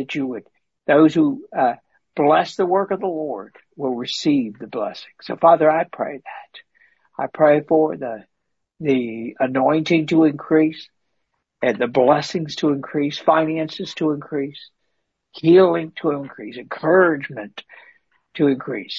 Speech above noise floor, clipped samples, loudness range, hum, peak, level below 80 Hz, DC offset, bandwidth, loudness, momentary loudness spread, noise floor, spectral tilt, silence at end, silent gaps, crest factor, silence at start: 58 dB; under 0.1%; 3 LU; none; -2 dBFS; -66 dBFS; under 0.1%; 7.8 kHz; -19 LUFS; 18 LU; -77 dBFS; -6.5 dB/octave; 0 s; none; 18 dB; 0 s